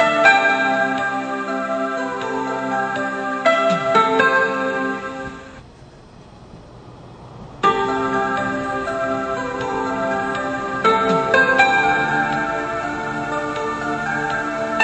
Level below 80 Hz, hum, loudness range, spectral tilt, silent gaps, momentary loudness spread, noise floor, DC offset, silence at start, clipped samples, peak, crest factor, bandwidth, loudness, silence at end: -50 dBFS; none; 6 LU; -4.5 dB/octave; none; 9 LU; -43 dBFS; under 0.1%; 0 s; under 0.1%; 0 dBFS; 20 dB; 9.4 kHz; -19 LUFS; 0 s